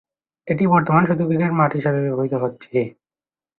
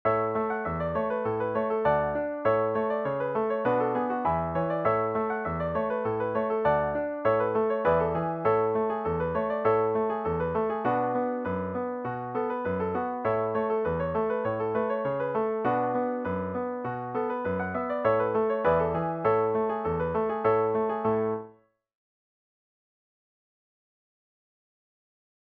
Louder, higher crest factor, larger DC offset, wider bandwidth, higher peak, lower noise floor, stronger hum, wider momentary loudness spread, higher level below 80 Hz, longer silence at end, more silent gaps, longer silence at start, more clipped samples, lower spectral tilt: first, -19 LUFS vs -28 LUFS; about the same, 18 dB vs 16 dB; neither; second, 4.1 kHz vs 4.6 kHz; first, -2 dBFS vs -12 dBFS; first, under -90 dBFS vs -57 dBFS; neither; about the same, 8 LU vs 6 LU; about the same, -58 dBFS vs -54 dBFS; second, 0.7 s vs 4.1 s; neither; first, 0.45 s vs 0.05 s; neither; first, -13 dB/octave vs -10 dB/octave